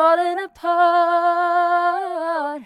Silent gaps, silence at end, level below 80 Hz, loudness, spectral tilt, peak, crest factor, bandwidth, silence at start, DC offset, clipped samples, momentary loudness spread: none; 0 s; -68 dBFS; -19 LUFS; -3 dB/octave; -4 dBFS; 14 dB; 11 kHz; 0 s; under 0.1%; under 0.1%; 8 LU